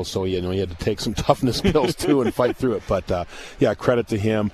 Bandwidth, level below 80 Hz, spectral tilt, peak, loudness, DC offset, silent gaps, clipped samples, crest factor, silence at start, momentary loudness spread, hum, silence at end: 14 kHz; -40 dBFS; -6 dB/octave; -2 dBFS; -22 LUFS; under 0.1%; none; under 0.1%; 20 dB; 0 s; 6 LU; none; 0 s